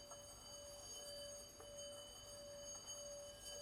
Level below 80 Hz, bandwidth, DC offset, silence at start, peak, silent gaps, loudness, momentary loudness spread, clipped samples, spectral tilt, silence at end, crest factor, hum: -72 dBFS; 16 kHz; under 0.1%; 0 s; -40 dBFS; none; -53 LUFS; 4 LU; under 0.1%; -1.5 dB/octave; 0 s; 14 dB; none